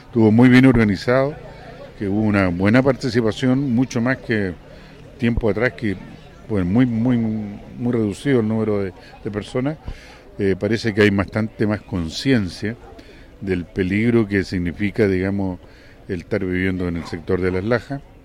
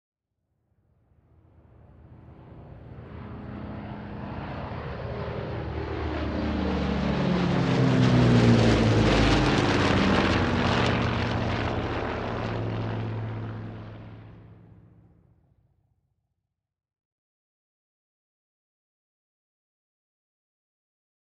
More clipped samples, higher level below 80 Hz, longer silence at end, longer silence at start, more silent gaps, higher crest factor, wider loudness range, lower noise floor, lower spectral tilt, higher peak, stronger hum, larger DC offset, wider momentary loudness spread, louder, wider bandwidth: neither; about the same, -40 dBFS vs -40 dBFS; second, 0.25 s vs 6.75 s; second, 0.1 s vs 2.1 s; neither; about the same, 16 dB vs 20 dB; second, 3 LU vs 20 LU; second, -42 dBFS vs -83 dBFS; about the same, -7.5 dB/octave vs -6.5 dB/octave; first, -2 dBFS vs -6 dBFS; neither; neither; second, 15 LU vs 20 LU; first, -20 LUFS vs -25 LUFS; first, 12 kHz vs 9.6 kHz